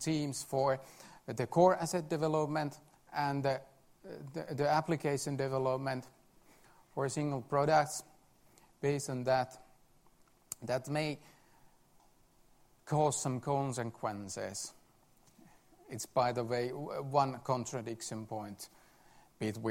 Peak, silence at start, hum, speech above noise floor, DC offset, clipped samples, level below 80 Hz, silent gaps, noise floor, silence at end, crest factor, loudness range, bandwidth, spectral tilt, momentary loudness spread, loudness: -14 dBFS; 0 s; none; 32 dB; under 0.1%; under 0.1%; -70 dBFS; none; -66 dBFS; 0 s; 22 dB; 5 LU; 16 kHz; -5 dB/octave; 13 LU; -35 LUFS